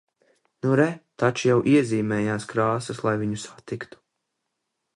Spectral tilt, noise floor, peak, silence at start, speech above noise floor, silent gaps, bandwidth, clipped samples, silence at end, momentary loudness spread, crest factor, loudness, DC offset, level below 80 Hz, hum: -6.5 dB/octave; -80 dBFS; -6 dBFS; 0.65 s; 56 dB; none; 11.5 kHz; under 0.1%; 1.1 s; 15 LU; 18 dB; -23 LUFS; under 0.1%; -62 dBFS; none